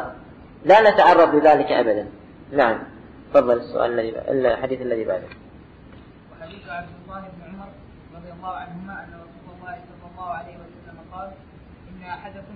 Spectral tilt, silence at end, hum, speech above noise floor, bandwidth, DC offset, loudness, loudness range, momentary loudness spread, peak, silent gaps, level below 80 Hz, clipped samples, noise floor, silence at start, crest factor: -6.5 dB/octave; 0 s; none; 24 dB; 7.8 kHz; under 0.1%; -18 LUFS; 20 LU; 26 LU; -2 dBFS; none; -52 dBFS; under 0.1%; -45 dBFS; 0 s; 20 dB